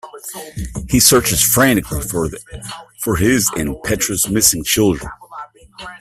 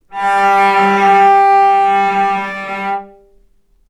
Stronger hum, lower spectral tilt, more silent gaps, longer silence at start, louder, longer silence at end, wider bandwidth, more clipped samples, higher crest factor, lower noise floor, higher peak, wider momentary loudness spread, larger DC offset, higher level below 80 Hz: neither; second, -3 dB/octave vs -4.5 dB/octave; neither; about the same, 0.05 s vs 0.1 s; second, -14 LUFS vs -11 LUFS; second, 0.05 s vs 0.85 s; first, 16 kHz vs 11.5 kHz; neither; first, 18 dB vs 12 dB; second, -36 dBFS vs -52 dBFS; about the same, 0 dBFS vs 0 dBFS; first, 20 LU vs 12 LU; neither; first, -36 dBFS vs -56 dBFS